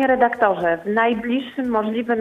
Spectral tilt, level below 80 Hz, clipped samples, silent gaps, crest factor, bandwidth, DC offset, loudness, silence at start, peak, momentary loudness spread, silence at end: -7 dB/octave; -56 dBFS; under 0.1%; none; 16 dB; 7 kHz; under 0.1%; -20 LUFS; 0 s; -4 dBFS; 6 LU; 0 s